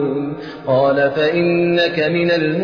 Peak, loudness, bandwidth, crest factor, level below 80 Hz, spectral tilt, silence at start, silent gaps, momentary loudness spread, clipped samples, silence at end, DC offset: -4 dBFS; -16 LUFS; 5.4 kHz; 12 dB; -56 dBFS; -7.5 dB/octave; 0 s; none; 8 LU; under 0.1%; 0 s; 0.1%